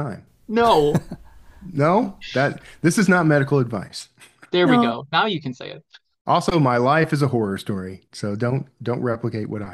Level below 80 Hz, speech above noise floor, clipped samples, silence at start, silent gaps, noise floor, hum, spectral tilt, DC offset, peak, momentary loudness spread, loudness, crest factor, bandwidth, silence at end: -50 dBFS; 24 dB; under 0.1%; 0 s; 6.21-6.25 s; -44 dBFS; none; -6 dB/octave; under 0.1%; -4 dBFS; 16 LU; -20 LUFS; 16 dB; 15 kHz; 0 s